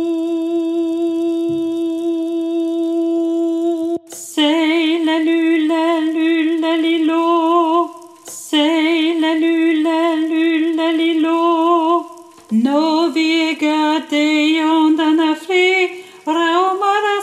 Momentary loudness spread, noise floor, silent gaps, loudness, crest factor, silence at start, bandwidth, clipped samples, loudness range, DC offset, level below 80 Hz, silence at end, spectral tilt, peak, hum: 6 LU; -36 dBFS; none; -16 LUFS; 12 dB; 0 s; 12.5 kHz; under 0.1%; 4 LU; under 0.1%; -70 dBFS; 0 s; -3.5 dB/octave; -4 dBFS; none